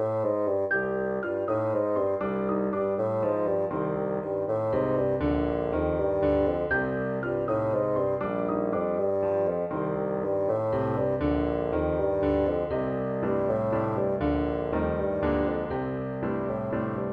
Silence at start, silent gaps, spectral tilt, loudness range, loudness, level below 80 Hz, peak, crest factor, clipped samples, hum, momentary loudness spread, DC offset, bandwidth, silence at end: 0 s; none; -10 dB/octave; 1 LU; -27 LUFS; -46 dBFS; -12 dBFS; 14 dB; under 0.1%; none; 4 LU; under 0.1%; 5.2 kHz; 0 s